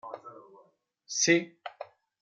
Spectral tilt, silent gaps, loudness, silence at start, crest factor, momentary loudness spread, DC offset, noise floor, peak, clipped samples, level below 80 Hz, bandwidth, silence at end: -2.5 dB/octave; none; -26 LUFS; 0.05 s; 22 dB; 24 LU; under 0.1%; -64 dBFS; -10 dBFS; under 0.1%; -84 dBFS; 9.2 kHz; 0.4 s